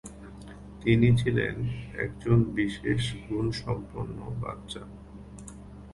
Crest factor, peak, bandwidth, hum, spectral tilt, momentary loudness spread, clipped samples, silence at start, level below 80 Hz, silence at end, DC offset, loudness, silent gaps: 20 dB; -8 dBFS; 11.5 kHz; none; -7 dB/octave; 23 LU; under 0.1%; 0.05 s; -46 dBFS; 0 s; under 0.1%; -28 LUFS; none